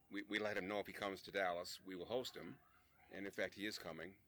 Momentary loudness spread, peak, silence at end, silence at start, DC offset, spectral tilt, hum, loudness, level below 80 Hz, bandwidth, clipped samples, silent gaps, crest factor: 11 LU; -28 dBFS; 0.1 s; 0.1 s; under 0.1%; -4 dB/octave; none; -46 LUFS; -78 dBFS; over 20 kHz; under 0.1%; none; 20 dB